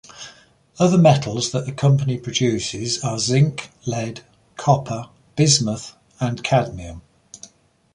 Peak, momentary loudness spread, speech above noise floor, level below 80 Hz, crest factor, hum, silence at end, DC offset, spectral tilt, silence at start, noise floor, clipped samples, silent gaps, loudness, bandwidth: -2 dBFS; 22 LU; 34 dB; -50 dBFS; 20 dB; none; 0.5 s; under 0.1%; -5 dB/octave; 0.15 s; -53 dBFS; under 0.1%; none; -20 LUFS; 11 kHz